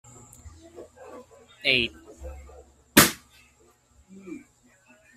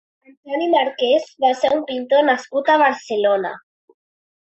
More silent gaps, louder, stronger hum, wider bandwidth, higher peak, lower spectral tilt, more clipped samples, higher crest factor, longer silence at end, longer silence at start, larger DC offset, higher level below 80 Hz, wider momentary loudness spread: neither; second, -21 LUFS vs -18 LUFS; neither; first, 15.5 kHz vs 8.2 kHz; first, 0 dBFS vs -4 dBFS; second, -2 dB/octave vs -3.5 dB/octave; neither; first, 30 dB vs 16 dB; about the same, 0.8 s vs 0.8 s; first, 0.8 s vs 0.45 s; neither; first, -52 dBFS vs -68 dBFS; first, 28 LU vs 7 LU